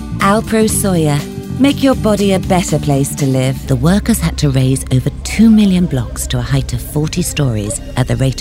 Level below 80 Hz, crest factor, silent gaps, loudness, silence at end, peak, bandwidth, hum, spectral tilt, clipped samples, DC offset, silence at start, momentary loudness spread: -26 dBFS; 12 dB; none; -14 LUFS; 0 s; 0 dBFS; 16.5 kHz; none; -5.5 dB/octave; under 0.1%; under 0.1%; 0 s; 7 LU